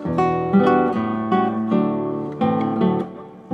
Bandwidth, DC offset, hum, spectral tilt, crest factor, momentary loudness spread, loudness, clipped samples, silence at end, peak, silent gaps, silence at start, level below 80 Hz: 7.2 kHz; under 0.1%; none; -9 dB/octave; 16 dB; 9 LU; -20 LUFS; under 0.1%; 0 s; -4 dBFS; none; 0 s; -52 dBFS